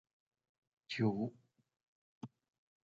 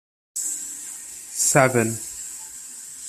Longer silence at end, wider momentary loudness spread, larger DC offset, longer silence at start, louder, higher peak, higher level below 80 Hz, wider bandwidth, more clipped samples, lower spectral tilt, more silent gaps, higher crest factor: first, 0.6 s vs 0 s; about the same, 19 LU vs 17 LU; neither; first, 0.9 s vs 0.35 s; second, -39 LUFS vs -23 LUFS; second, -22 dBFS vs -2 dBFS; second, -80 dBFS vs -62 dBFS; second, 7.4 kHz vs 15 kHz; neither; first, -6 dB/octave vs -3.5 dB/octave; first, 1.83-2.21 s vs none; about the same, 22 dB vs 22 dB